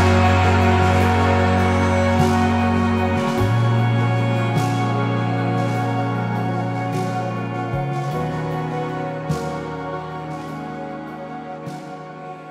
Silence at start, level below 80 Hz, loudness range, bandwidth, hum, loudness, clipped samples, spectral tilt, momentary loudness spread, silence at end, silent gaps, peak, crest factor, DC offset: 0 s; -44 dBFS; 10 LU; 14 kHz; none; -20 LUFS; under 0.1%; -7 dB/octave; 15 LU; 0 s; none; -4 dBFS; 16 dB; under 0.1%